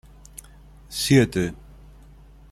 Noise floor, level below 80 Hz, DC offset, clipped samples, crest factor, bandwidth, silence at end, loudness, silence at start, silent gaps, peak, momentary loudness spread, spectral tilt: -48 dBFS; -46 dBFS; under 0.1%; under 0.1%; 20 dB; 15.5 kHz; 0.95 s; -22 LUFS; 0.9 s; none; -4 dBFS; 25 LU; -5.5 dB/octave